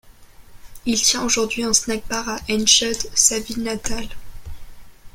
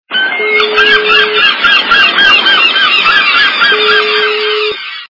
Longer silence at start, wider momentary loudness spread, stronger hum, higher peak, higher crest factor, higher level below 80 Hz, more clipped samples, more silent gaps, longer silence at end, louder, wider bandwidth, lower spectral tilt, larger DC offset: about the same, 0.05 s vs 0.1 s; first, 13 LU vs 7 LU; neither; about the same, 0 dBFS vs 0 dBFS; first, 22 dB vs 8 dB; first, -40 dBFS vs -48 dBFS; second, under 0.1% vs 1%; neither; about the same, 0.05 s vs 0.05 s; second, -18 LUFS vs -6 LUFS; first, 16.5 kHz vs 6 kHz; about the same, -1 dB/octave vs -1.5 dB/octave; neither